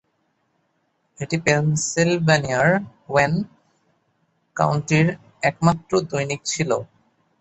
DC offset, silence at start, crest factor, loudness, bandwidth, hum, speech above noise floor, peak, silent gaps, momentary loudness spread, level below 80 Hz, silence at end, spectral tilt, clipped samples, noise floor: under 0.1%; 1.2 s; 20 dB; -21 LUFS; 8.2 kHz; none; 49 dB; -2 dBFS; none; 8 LU; -54 dBFS; 0.55 s; -5 dB/octave; under 0.1%; -69 dBFS